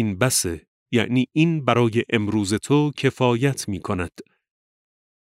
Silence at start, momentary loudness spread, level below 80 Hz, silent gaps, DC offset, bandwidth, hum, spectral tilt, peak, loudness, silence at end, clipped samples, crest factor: 0 s; 9 LU; -52 dBFS; 0.68-0.86 s; under 0.1%; 16 kHz; none; -5 dB/octave; -2 dBFS; -21 LUFS; 1 s; under 0.1%; 20 dB